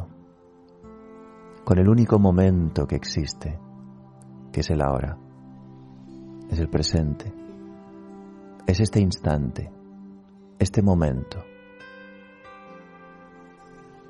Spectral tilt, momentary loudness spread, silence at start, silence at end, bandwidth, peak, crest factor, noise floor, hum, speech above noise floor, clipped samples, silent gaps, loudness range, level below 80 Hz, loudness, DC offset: -7 dB/octave; 27 LU; 0 s; 1.3 s; 11.5 kHz; -4 dBFS; 20 dB; -52 dBFS; none; 31 dB; under 0.1%; none; 8 LU; -42 dBFS; -23 LUFS; under 0.1%